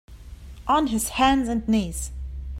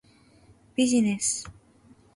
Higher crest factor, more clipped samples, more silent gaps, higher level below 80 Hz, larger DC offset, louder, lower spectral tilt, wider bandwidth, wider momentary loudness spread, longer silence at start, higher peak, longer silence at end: about the same, 18 dB vs 16 dB; neither; neither; first, -36 dBFS vs -62 dBFS; neither; about the same, -23 LUFS vs -25 LUFS; about the same, -4 dB/octave vs -3.5 dB/octave; first, 16 kHz vs 11.5 kHz; first, 15 LU vs 12 LU; second, 0.1 s vs 0.8 s; first, -6 dBFS vs -12 dBFS; second, 0 s vs 0.65 s